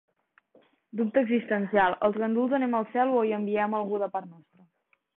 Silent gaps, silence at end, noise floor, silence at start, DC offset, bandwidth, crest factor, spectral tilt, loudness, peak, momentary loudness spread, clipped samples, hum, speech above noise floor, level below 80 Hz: none; 0.85 s; -71 dBFS; 0.95 s; under 0.1%; 4 kHz; 18 dB; -10.5 dB/octave; -27 LUFS; -10 dBFS; 7 LU; under 0.1%; none; 45 dB; -70 dBFS